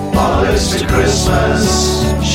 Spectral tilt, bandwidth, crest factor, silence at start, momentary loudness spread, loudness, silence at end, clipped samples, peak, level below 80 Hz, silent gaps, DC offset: -4.5 dB/octave; 16.5 kHz; 12 dB; 0 s; 2 LU; -13 LUFS; 0 s; under 0.1%; 0 dBFS; -20 dBFS; none; under 0.1%